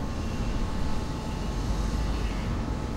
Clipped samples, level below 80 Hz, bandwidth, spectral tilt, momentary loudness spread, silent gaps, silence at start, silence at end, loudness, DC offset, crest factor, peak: under 0.1%; -32 dBFS; 13 kHz; -6 dB/octave; 3 LU; none; 0 s; 0 s; -32 LUFS; under 0.1%; 12 dB; -16 dBFS